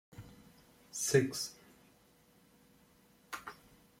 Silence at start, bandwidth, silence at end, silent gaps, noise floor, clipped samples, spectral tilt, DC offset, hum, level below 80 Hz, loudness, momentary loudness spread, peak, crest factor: 0.15 s; 16.5 kHz; 0.45 s; none; -67 dBFS; under 0.1%; -4 dB/octave; under 0.1%; none; -72 dBFS; -35 LUFS; 27 LU; -14 dBFS; 26 dB